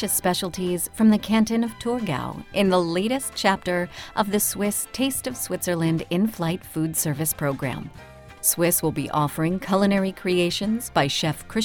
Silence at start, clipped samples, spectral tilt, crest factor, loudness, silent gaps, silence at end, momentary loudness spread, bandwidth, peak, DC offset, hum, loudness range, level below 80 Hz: 0 s; under 0.1%; -4.5 dB/octave; 20 dB; -23 LUFS; none; 0 s; 7 LU; 19.5 kHz; -4 dBFS; under 0.1%; none; 2 LU; -50 dBFS